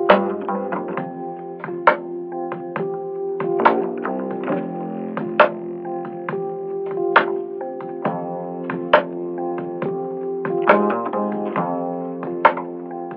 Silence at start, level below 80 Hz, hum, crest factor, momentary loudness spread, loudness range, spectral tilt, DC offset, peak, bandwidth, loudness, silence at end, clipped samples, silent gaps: 0 s; -66 dBFS; none; 22 dB; 11 LU; 3 LU; -4 dB/octave; under 0.1%; 0 dBFS; 5.6 kHz; -22 LUFS; 0 s; under 0.1%; none